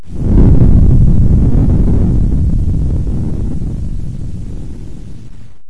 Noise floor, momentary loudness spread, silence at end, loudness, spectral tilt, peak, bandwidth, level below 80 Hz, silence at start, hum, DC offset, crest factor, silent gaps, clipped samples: -33 dBFS; 19 LU; 0 s; -13 LUFS; -10.5 dB/octave; 0 dBFS; 3.6 kHz; -14 dBFS; 0 s; none; 6%; 10 dB; none; under 0.1%